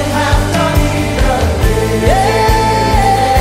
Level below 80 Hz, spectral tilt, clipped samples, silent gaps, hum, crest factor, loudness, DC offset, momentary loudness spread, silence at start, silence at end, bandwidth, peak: -18 dBFS; -5 dB/octave; under 0.1%; none; none; 10 dB; -12 LUFS; under 0.1%; 3 LU; 0 s; 0 s; 16 kHz; 0 dBFS